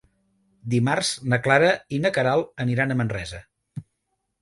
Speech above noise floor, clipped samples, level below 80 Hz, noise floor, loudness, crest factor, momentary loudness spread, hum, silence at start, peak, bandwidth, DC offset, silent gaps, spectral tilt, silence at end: 54 dB; under 0.1%; -54 dBFS; -77 dBFS; -22 LUFS; 20 dB; 22 LU; none; 0.65 s; -4 dBFS; 11.5 kHz; under 0.1%; none; -5 dB/octave; 0.6 s